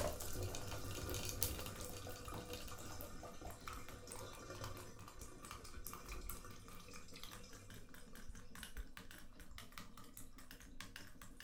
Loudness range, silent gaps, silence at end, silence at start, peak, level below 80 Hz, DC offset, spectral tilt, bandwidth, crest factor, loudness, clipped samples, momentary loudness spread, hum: 10 LU; none; 0 s; 0 s; -16 dBFS; -56 dBFS; under 0.1%; -3.5 dB/octave; 18 kHz; 34 dB; -51 LUFS; under 0.1%; 13 LU; none